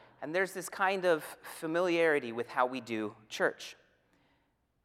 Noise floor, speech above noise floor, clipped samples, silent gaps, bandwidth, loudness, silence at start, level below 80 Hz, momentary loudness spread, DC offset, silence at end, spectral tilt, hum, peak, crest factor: -75 dBFS; 43 dB; under 0.1%; none; 16 kHz; -32 LUFS; 0.2 s; -80 dBFS; 12 LU; under 0.1%; 1.1 s; -4 dB/octave; none; -14 dBFS; 20 dB